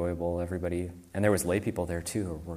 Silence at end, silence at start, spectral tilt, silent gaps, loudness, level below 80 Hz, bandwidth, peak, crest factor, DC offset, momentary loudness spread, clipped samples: 0 s; 0 s; -6 dB/octave; none; -31 LUFS; -48 dBFS; 15.5 kHz; -12 dBFS; 18 dB; under 0.1%; 7 LU; under 0.1%